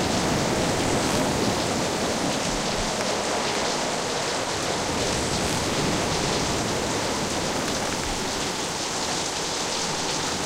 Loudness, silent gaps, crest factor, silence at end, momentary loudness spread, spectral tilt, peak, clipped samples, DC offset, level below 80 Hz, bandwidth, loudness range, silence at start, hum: -24 LUFS; none; 16 dB; 0 s; 3 LU; -3 dB/octave; -10 dBFS; under 0.1%; under 0.1%; -42 dBFS; 16 kHz; 2 LU; 0 s; none